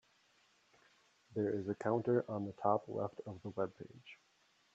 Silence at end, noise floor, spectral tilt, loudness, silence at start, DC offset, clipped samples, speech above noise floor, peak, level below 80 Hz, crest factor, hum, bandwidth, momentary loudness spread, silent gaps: 0.6 s; -72 dBFS; -8.5 dB/octave; -39 LUFS; 1.3 s; under 0.1%; under 0.1%; 34 dB; -18 dBFS; -82 dBFS; 22 dB; none; 8 kHz; 19 LU; none